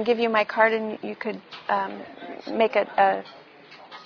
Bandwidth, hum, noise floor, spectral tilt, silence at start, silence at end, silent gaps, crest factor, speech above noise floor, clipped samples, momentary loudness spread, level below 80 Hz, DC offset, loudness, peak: 5.4 kHz; none; -47 dBFS; -6 dB/octave; 0 s; 0 s; none; 20 dB; 23 dB; under 0.1%; 18 LU; -74 dBFS; under 0.1%; -24 LUFS; -6 dBFS